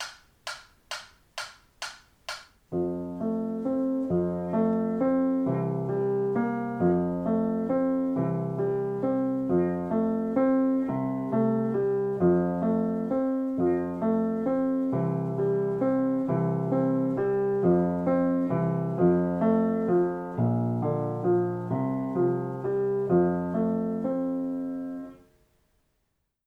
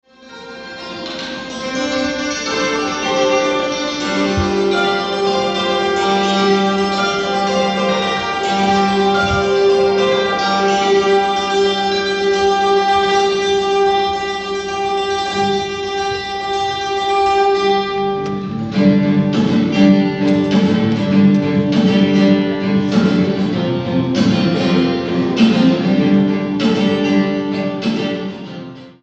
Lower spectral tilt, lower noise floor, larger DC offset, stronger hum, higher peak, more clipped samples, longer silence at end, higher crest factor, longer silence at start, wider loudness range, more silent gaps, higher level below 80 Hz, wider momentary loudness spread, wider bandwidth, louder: first, -8.5 dB/octave vs -5.5 dB/octave; first, -76 dBFS vs -36 dBFS; neither; neither; second, -12 dBFS vs 0 dBFS; neither; first, 1.3 s vs 0.1 s; about the same, 16 dB vs 14 dB; second, 0 s vs 0.2 s; about the same, 4 LU vs 4 LU; neither; second, -62 dBFS vs -44 dBFS; first, 14 LU vs 8 LU; first, 10 kHz vs 8.4 kHz; second, -27 LUFS vs -15 LUFS